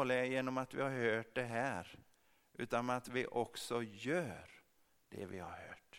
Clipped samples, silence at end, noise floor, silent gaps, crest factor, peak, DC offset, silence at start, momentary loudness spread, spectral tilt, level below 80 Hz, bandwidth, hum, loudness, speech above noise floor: under 0.1%; 0 s; -73 dBFS; none; 20 dB; -20 dBFS; under 0.1%; 0 s; 16 LU; -5 dB/octave; -74 dBFS; 16.5 kHz; none; -40 LUFS; 33 dB